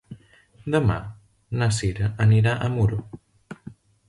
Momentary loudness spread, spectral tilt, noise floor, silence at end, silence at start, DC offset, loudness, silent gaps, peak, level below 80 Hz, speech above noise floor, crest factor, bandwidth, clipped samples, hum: 23 LU; -6.5 dB/octave; -54 dBFS; 0.35 s; 0.1 s; under 0.1%; -23 LUFS; none; -6 dBFS; -44 dBFS; 33 dB; 18 dB; 11.5 kHz; under 0.1%; none